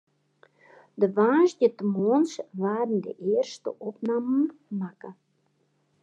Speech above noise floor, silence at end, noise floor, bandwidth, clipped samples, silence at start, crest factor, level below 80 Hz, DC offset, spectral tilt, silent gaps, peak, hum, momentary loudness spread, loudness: 45 dB; 0.9 s; -70 dBFS; 9 kHz; under 0.1%; 0.95 s; 18 dB; -88 dBFS; under 0.1%; -7 dB/octave; none; -10 dBFS; none; 14 LU; -26 LUFS